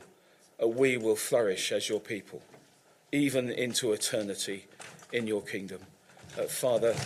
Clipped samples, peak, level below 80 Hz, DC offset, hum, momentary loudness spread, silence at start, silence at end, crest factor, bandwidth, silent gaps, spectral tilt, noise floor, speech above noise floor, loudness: under 0.1%; -14 dBFS; -72 dBFS; under 0.1%; none; 17 LU; 0 s; 0 s; 18 dB; 16 kHz; none; -3.5 dB/octave; -62 dBFS; 32 dB; -30 LUFS